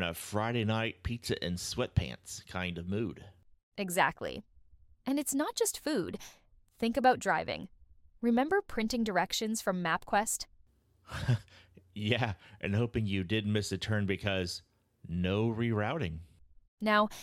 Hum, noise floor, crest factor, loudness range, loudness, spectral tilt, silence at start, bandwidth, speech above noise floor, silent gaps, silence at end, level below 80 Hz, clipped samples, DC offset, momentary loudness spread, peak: none; -65 dBFS; 22 dB; 3 LU; -33 LUFS; -4.5 dB/octave; 0 s; 16.5 kHz; 33 dB; 3.63-3.72 s, 16.68-16.78 s; 0 s; -54 dBFS; under 0.1%; under 0.1%; 12 LU; -12 dBFS